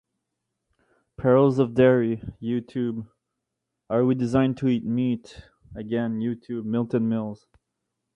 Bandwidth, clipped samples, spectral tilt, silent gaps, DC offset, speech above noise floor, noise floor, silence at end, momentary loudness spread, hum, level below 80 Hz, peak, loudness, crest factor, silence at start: 8.8 kHz; under 0.1%; -9 dB/octave; none; under 0.1%; 59 dB; -82 dBFS; 0.8 s; 13 LU; none; -56 dBFS; -6 dBFS; -24 LUFS; 18 dB; 1.2 s